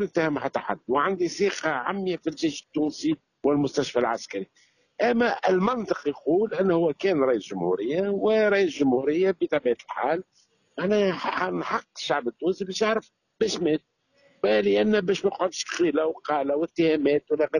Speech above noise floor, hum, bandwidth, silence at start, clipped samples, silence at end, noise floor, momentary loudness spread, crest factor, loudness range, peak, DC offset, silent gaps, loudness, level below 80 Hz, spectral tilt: 38 dB; none; 10.5 kHz; 0 s; under 0.1%; 0 s; -63 dBFS; 7 LU; 16 dB; 4 LU; -10 dBFS; under 0.1%; none; -25 LUFS; -66 dBFS; -5 dB/octave